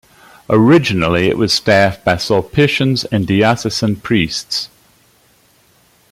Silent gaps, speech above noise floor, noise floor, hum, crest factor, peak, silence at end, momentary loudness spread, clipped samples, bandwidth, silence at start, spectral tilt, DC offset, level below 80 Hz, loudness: none; 39 dB; -53 dBFS; none; 14 dB; 0 dBFS; 1.45 s; 7 LU; under 0.1%; 16 kHz; 0.5 s; -5.5 dB/octave; under 0.1%; -44 dBFS; -14 LUFS